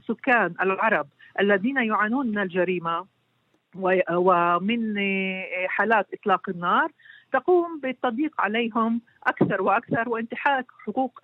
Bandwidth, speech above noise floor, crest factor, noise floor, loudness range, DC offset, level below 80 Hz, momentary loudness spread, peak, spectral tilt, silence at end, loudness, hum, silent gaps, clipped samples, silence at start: 4.7 kHz; 45 dB; 18 dB; -69 dBFS; 2 LU; under 0.1%; -74 dBFS; 7 LU; -6 dBFS; -8.5 dB/octave; 0.05 s; -24 LUFS; none; none; under 0.1%; 0.1 s